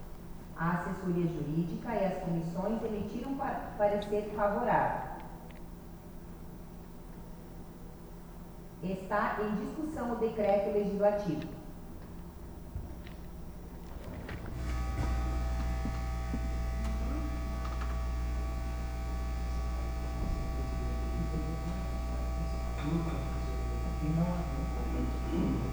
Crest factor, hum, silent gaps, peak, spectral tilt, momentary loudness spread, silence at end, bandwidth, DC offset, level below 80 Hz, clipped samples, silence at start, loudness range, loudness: 20 dB; none; none; -14 dBFS; -7.5 dB/octave; 18 LU; 0 s; over 20 kHz; under 0.1%; -38 dBFS; under 0.1%; 0 s; 9 LU; -35 LUFS